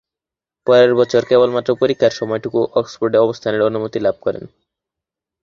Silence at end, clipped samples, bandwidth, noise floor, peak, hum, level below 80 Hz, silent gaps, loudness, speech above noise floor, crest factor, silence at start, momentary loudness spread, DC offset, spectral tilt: 0.95 s; under 0.1%; 7.2 kHz; -87 dBFS; -2 dBFS; none; -56 dBFS; none; -16 LUFS; 72 dB; 16 dB; 0.65 s; 10 LU; under 0.1%; -6 dB/octave